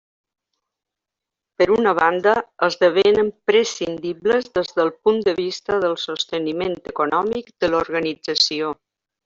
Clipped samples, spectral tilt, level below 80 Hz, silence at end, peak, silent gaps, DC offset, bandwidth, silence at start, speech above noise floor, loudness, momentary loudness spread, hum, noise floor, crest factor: under 0.1%; -3.5 dB/octave; -56 dBFS; 0.5 s; -4 dBFS; none; under 0.1%; 7.6 kHz; 1.6 s; 66 dB; -20 LUFS; 9 LU; none; -85 dBFS; 18 dB